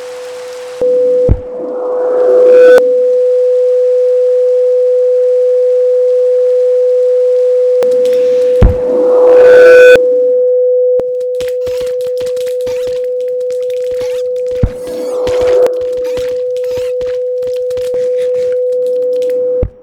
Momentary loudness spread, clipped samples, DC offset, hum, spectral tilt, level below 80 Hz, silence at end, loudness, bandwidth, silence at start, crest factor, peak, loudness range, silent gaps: 11 LU; 2%; under 0.1%; none; -6 dB/octave; -26 dBFS; 0.15 s; -10 LUFS; 9.6 kHz; 0 s; 10 dB; 0 dBFS; 9 LU; none